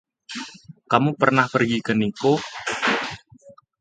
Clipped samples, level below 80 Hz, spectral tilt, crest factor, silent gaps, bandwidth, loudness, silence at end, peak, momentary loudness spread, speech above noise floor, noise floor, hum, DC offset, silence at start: under 0.1%; -60 dBFS; -5.5 dB/octave; 22 dB; none; 9.4 kHz; -21 LUFS; 0.3 s; 0 dBFS; 16 LU; 30 dB; -50 dBFS; none; under 0.1%; 0.3 s